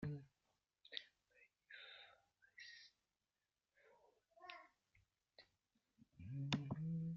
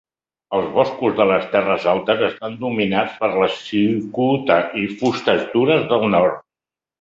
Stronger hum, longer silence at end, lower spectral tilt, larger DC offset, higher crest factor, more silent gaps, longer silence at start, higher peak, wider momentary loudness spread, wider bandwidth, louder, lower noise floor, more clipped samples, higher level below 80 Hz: neither; second, 0 s vs 0.6 s; second, -5 dB/octave vs -6.5 dB/octave; neither; first, 28 dB vs 18 dB; neither; second, 0 s vs 0.5 s; second, -24 dBFS vs -2 dBFS; first, 23 LU vs 6 LU; about the same, 7.2 kHz vs 7.8 kHz; second, -51 LUFS vs -18 LUFS; about the same, under -90 dBFS vs -90 dBFS; neither; second, -78 dBFS vs -56 dBFS